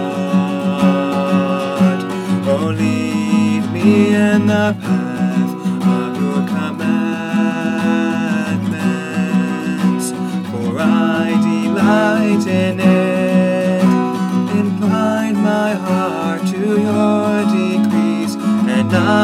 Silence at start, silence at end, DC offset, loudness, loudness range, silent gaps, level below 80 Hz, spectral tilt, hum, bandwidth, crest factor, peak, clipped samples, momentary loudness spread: 0 s; 0 s; under 0.1%; -16 LUFS; 3 LU; none; -60 dBFS; -6.5 dB/octave; none; 14 kHz; 14 dB; 0 dBFS; under 0.1%; 5 LU